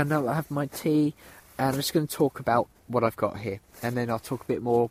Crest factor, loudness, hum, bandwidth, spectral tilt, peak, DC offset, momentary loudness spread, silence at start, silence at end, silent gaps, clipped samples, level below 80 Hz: 18 dB; -28 LUFS; none; 16 kHz; -6 dB/octave; -8 dBFS; under 0.1%; 7 LU; 0 s; 0 s; none; under 0.1%; -60 dBFS